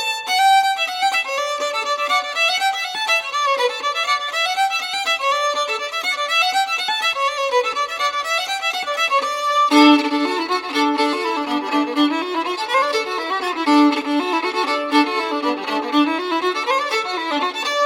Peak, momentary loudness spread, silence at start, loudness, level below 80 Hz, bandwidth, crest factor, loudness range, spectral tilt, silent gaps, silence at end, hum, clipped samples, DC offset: -2 dBFS; 6 LU; 0 s; -18 LUFS; -68 dBFS; 16.5 kHz; 18 dB; 2 LU; -1 dB/octave; none; 0 s; none; under 0.1%; under 0.1%